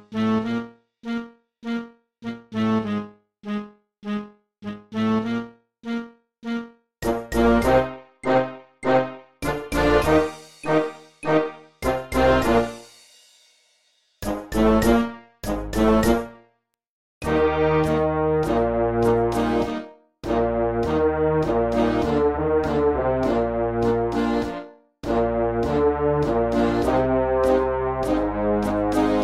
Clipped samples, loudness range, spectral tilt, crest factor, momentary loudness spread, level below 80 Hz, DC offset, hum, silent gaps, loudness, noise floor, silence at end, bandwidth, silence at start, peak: under 0.1%; 8 LU; -6.5 dB/octave; 16 dB; 15 LU; -38 dBFS; under 0.1%; none; 16.89-17.21 s; -22 LUFS; -67 dBFS; 0 s; 16 kHz; 0.1 s; -6 dBFS